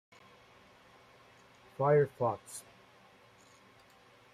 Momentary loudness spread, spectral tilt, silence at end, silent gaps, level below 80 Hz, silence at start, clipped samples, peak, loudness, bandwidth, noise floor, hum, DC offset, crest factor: 20 LU; -6.5 dB/octave; 1.75 s; none; -76 dBFS; 1.8 s; under 0.1%; -16 dBFS; -31 LUFS; 14.5 kHz; -62 dBFS; none; under 0.1%; 22 dB